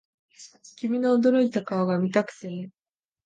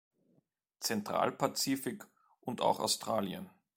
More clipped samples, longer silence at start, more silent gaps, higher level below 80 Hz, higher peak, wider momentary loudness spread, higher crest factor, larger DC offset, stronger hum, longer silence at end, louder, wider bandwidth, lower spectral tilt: neither; second, 0.4 s vs 0.8 s; neither; about the same, -76 dBFS vs -76 dBFS; first, -8 dBFS vs -14 dBFS; first, 17 LU vs 12 LU; about the same, 18 dB vs 22 dB; neither; neither; first, 0.55 s vs 0.3 s; first, -24 LUFS vs -34 LUFS; second, 9 kHz vs 16.5 kHz; first, -7 dB/octave vs -3.5 dB/octave